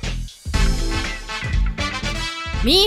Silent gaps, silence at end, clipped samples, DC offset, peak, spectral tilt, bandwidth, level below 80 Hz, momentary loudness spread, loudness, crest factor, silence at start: none; 0 s; under 0.1%; under 0.1%; -2 dBFS; -4 dB/octave; 15.5 kHz; -24 dBFS; 5 LU; -23 LUFS; 20 dB; 0 s